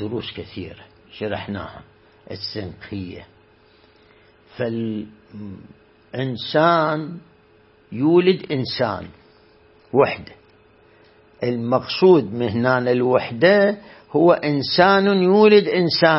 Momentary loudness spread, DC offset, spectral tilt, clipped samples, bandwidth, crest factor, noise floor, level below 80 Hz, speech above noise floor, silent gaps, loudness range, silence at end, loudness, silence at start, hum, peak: 20 LU; under 0.1%; -10 dB/octave; under 0.1%; 5.8 kHz; 18 dB; -54 dBFS; -58 dBFS; 35 dB; none; 15 LU; 0 s; -18 LUFS; 0 s; none; -2 dBFS